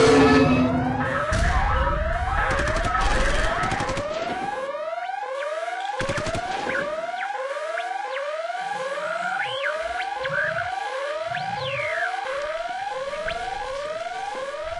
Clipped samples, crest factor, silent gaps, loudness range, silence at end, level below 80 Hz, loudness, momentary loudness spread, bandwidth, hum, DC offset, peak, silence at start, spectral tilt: under 0.1%; 18 dB; none; 5 LU; 0 s; -34 dBFS; -25 LUFS; 7 LU; 11.5 kHz; none; under 0.1%; -8 dBFS; 0 s; -5 dB/octave